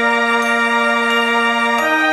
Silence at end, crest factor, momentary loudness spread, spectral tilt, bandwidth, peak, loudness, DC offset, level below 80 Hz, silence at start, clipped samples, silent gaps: 0 s; 12 dB; 0 LU; -2 dB/octave; 15 kHz; -4 dBFS; -14 LUFS; under 0.1%; -60 dBFS; 0 s; under 0.1%; none